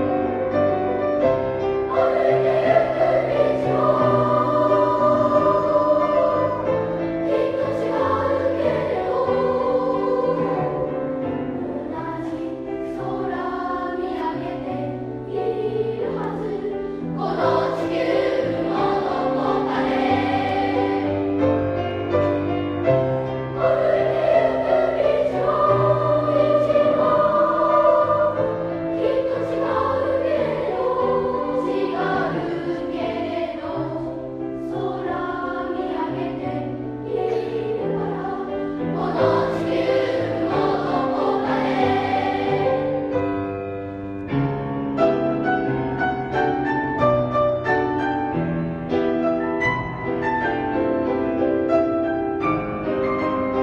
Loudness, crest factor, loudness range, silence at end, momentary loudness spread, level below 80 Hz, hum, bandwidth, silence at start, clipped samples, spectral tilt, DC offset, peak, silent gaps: -21 LUFS; 16 dB; 8 LU; 0 s; 9 LU; -48 dBFS; none; 9 kHz; 0 s; under 0.1%; -8 dB/octave; under 0.1%; -4 dBFS; none